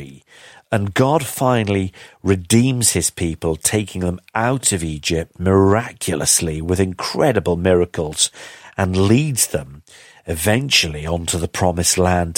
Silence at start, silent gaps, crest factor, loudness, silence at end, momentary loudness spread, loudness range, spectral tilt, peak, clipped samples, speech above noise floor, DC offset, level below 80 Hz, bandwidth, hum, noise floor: 0 s; none; 18 dB; -18 LUFS; 0.05 s; 8 LU; 1 LU; -4 dB/octave; 0 dBFS; under 0.1%; 28 dB; under 0.1%; -40 dBFS; 16.5 kHz; none; -45 dBFS